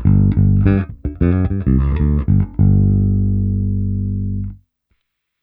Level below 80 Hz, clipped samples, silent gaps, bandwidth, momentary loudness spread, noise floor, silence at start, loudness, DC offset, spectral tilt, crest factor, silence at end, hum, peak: -22 dBFS; under 0.1%; none; 2.8 kHz; 8 LU; -69 dBFS; 0 s; -16 LUFS; under 0.1%; -13.5 dB/octave; 16 dB; 0.9 s; none; 0 dBFS